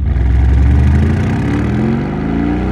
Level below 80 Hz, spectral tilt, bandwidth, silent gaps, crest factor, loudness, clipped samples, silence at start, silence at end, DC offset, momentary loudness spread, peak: -16 dBFS; -9 dB/octave; 7 kHz; none; 10 dB; -14 LUFS; under 0.1%; 0 s; 0 s; under 0.1%; 5 LU; -2 dBFS